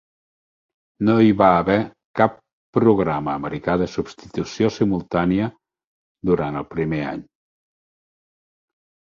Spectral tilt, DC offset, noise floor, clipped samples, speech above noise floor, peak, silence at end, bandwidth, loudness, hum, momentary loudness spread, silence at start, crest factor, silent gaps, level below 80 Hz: -7.5 dB/octave; under 0.1%; under -90 dBFS; under 0.1%; over 71 dB; -2 dBFS; 1.8 s; 7.4 kHz; -21 LUFS; none; 13 LU; 1 s; 20 dB; 2.05-2.14 s, 2.53-2.73 s, 5.87-6.15 s; -48 dBFS